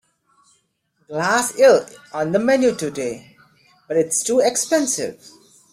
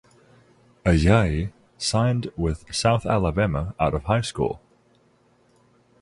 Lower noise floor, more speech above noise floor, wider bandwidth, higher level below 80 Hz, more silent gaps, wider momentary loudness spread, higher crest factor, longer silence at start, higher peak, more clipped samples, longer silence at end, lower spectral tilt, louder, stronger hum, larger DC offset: first, -67 dBFS vs -61 dBFS; first, 48 dB vs 39 dB; first, 15.5 kHz vs 11.5 kHz; second, -64 dBFS vs -36 dBFS; neither; first, 15 LU vs 9 LU; about the same, 18 dB vs 18 dB; first, 1.1 s vs 0.85 s; first, -2 dBFS vs -6 dBFS; neither; second, 0.6 s vs 1.45 s; second, -3 dB/octave vs -6 dB/octave; first, -19 LUFS vs -23 LUFS; second, none vs 60 Hz at -45 dBFS; neither